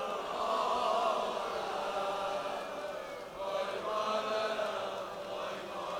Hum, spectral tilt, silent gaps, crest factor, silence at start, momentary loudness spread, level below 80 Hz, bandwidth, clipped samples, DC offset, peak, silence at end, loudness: none; -3 dB/octave; none; 16 dB; 0 s; 9 LU; -68 dBFS; 17 kHz; under 0.1%; under 0.1%; -20 dBFS; 0 s; -35 LUFS